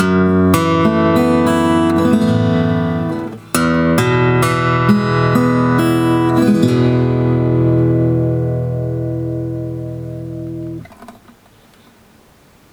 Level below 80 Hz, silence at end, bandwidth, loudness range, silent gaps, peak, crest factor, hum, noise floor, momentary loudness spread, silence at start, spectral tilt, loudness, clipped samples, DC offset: -40 dBFS; 1.6 s; over 20 kHz; 11 LU; none; 0 dBFS; 14 dB; none; -48 dBFS; 12 LU; 0 s; -7 dB/octave; -14 LUFS; under 0.1%; under 0.1%